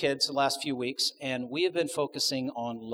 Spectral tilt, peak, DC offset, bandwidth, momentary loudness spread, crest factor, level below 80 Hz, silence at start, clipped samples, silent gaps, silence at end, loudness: -3 dB/octave; -12 dBFS; under 0.1%; over 20 kHz; 7 LU; 18 dB; -74 dBFS; 0 s; under 0.1%; none; 0 s; -29 LUFS